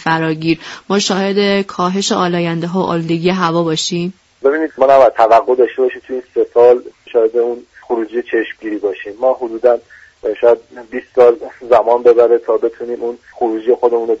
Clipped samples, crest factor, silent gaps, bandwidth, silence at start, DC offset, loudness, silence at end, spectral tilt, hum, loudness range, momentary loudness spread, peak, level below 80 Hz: under 0.1%; 14 dB; none; 8 kHz; 0 s; under 0.1%; -14 LUFS; 0 s; -5 dB/octave; none; 5 LU; 12 LU; 0 dBFS; -54 dBFS